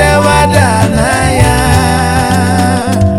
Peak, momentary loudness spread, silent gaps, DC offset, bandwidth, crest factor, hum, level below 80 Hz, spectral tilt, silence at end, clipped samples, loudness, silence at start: 0 dBFS; 3 LU; none; 2%; 15.5 kHz; 8 dB; none; -20 dBFS; -5 dB/octave; 0 s; 1%; -9 LUFS; 0 s